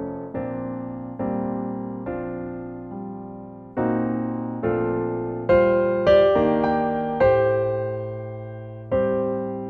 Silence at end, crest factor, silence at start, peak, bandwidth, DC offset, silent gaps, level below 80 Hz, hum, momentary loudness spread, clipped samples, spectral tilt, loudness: 0 s; 18 dB; 0 s; -6 dBFS; 6 kHz; under 0.1%; none; -48 dBFS; none; 16 LU; under 0.1%; -9 dB/octave; -23 LUFS